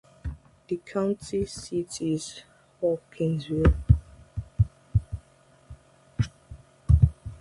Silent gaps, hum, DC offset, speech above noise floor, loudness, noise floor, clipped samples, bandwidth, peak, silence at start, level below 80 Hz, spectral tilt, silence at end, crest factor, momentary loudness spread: none; none; under 0.1%; 31 dB; -27 LUFS; -58 dBFS; under 0.1%; 11.5 kHz; -4 dBFS; 0.25 s; -32 dBFS; -7.5 dB/octave; 0.05 s; 22 dB; 18 LU